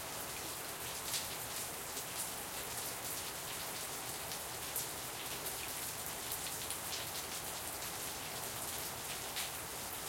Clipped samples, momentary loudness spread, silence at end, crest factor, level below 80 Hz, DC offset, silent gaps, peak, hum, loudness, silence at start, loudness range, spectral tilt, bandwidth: under 0.1%; 2 LU; 0 s; 24 dB; -64 dBFS; under 0.1%; none; -18 dBFS; none; -40 LUFS; 0 s; 1 LU; -1 dB/octave; 17 kHz